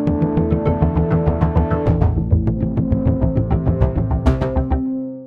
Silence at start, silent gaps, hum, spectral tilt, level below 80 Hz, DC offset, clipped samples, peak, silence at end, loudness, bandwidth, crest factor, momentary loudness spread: 0 s; none; none; -11 dB/octave; -24 dBFS; under 0.1%; under 0.1%; -2 dBFS; 0 s; -18 LUFS; 5 kHz; 14 dB; 3 LU